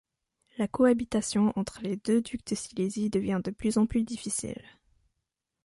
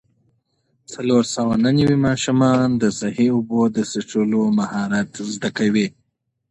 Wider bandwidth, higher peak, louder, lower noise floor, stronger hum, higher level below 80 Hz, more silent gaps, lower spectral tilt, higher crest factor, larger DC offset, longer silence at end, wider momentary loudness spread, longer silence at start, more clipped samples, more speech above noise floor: about the same, 11.5 kHz vs 10.5 kHz; second, -10 dBFS vs -4 dBFS; second, -29 LUFS vs -19 LUFS; first, -84 dBFS vs -72 dBFS; neither; about the same, -56 dBFS vs -52 dBFS; neither; about the same, -5.5 dB/octave vs -6 dB/octave; about the same, 20 dB vs 16 dB; neither; first, 1.1 s vs 0.6 s; about the same, 9 LU vs 8 LU; second, 0.6 s vs 0.9 s; neither; about the same, 56 dB vs 53 dB